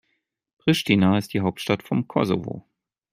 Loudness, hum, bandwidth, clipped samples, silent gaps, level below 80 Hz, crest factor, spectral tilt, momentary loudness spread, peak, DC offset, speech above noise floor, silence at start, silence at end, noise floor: -23 LUFS; none; 16 kHz; under 0.1%; none; -60 dBFS; 20 dB; -6 dB/octave; 8 LU; -4 dBFS; under 0.1%; 52 dB; 0.65 s; 0.5 s; -74 dBFS